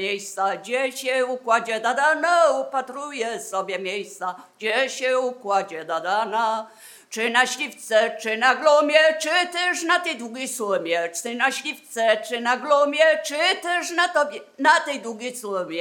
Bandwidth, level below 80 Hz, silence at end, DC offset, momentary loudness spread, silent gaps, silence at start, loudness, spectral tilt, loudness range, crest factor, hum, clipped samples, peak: 18 kHz; under -90 dBFS; 0 s; under 0.1%; 11 LU; none; 0 s; -22 LUFS; -1.5 dB/octave; 5 LU; 22 dB; none; under 0.1%; -2 dBFS